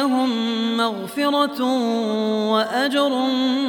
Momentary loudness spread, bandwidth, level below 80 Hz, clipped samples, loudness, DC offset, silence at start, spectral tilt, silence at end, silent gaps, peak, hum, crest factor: 2 LU; 19 kHz; -72 dBFS; under 0.1%; -20 LUFS; under 0.1%; 0 s; -4.5 dB/octave; 0 s; none; -6 dBFS; none; 14 dB